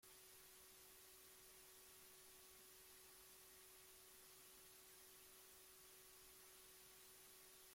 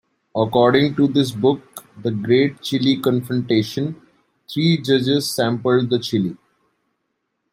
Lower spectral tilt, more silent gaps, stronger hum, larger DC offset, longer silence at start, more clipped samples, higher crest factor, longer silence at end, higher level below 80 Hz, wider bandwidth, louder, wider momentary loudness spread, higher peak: second, -0.5 dB/octave vs -6 dB/octave; neither; neither; neither; second, 0 s vs 0.35 s; neither; about the same, 14 dB vs 18 dB; second, 0 s vs 1.2 s; second, -86 dBFS vs -60 dBFS; about the same, 16.5 kHz vs 16 kHz; second, -63 LUFS vs -19 LUFS; second, 0 LU vs 11 LU; second, -52 dBFS vs 0 dBFS